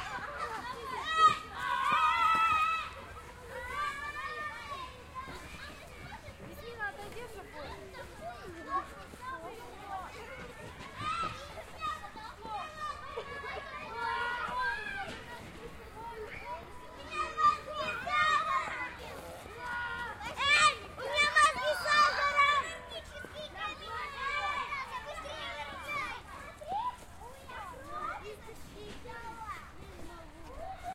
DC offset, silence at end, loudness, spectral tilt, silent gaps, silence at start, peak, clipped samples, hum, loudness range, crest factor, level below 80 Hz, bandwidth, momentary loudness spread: under 0.1%; 0 s; -33 LUFS; -2 dB/octave; none; 0 s; -14 dBFS; under 0.1%; none; 14 LU; 22 dB; -56 dBFS; 16 kHz; 20 LU